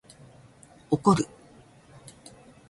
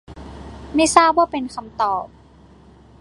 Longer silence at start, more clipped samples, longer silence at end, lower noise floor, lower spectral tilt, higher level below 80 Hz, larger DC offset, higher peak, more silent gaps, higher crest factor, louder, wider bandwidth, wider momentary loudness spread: first, 0.9 s vs 0.1 s; neither; first, 1.45 s vs 0.95 s; first, -54 dBFS vs -47 dBFS; first, -6.5 dB/octave vs -3 dB/octave; second, -60 dBFS vs -44 dBFS; neither; second, -8 dBFS vs 0 dBFS; neither; about the same, 24 dB vs 20 dB; second, -25 LUFS vs -18 LUFS; about the same, 11.5 kHz vs 11.5 kHz; first, 27 LU vs 24 LU